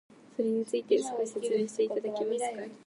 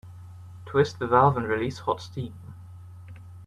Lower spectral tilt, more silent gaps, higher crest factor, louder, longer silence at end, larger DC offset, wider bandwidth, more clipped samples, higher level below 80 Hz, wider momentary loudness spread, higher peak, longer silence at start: second, -4.5 dB/octave vs -7 dB/octave; neither; about the same, 16 dB vs 20 dB; second, -31 LUFS vs -25 LUFS; about the same, 0.1 s vs 0 s; neither; about the same, 11.5 kHz vs 12 kHz; neither; second, -84 dBFS vs -58 dBFS; second, 5 LU vs 25 LU; second, -14 dBFS vs -8 dBFS; first, 0.4 s vs 0.05 s